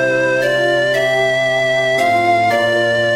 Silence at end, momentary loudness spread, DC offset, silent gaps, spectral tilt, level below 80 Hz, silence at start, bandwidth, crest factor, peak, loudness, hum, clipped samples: 0 s; 1 LU; 0.3%; none; -4 dB/octave; -54 dBFS; 0 s; 15.5 kHz; 10 dB; -4 dBFS; -14 LUFS; none; under 0.1%